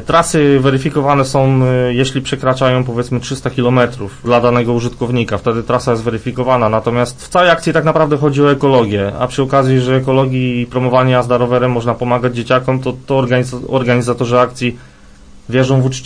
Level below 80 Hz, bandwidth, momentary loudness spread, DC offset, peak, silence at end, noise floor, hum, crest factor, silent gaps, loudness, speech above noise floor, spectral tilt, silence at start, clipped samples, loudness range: -40 dBFS; 10.5 kHz; 6 LU; under 0.1%; 0 dBFS; 0 s; -38 dBFS; none; 12 dB; none; -13 LUFS; 25 dB; -6.5 dB/octave; 0 s; under 0.1%; 2 LU